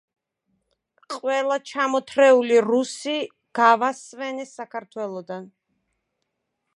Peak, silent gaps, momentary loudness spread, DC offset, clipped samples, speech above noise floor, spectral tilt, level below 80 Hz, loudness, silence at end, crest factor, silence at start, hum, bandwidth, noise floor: -2 dBFS; none; 17 LU; under 0.1%; under 0.1%; 56 dB; -3.5 dB/octave; -80 dBFS; -21 LUFS; 1.3 s; 20 dB; 1.1 s; none; 11.5 kHz; -78 dBFS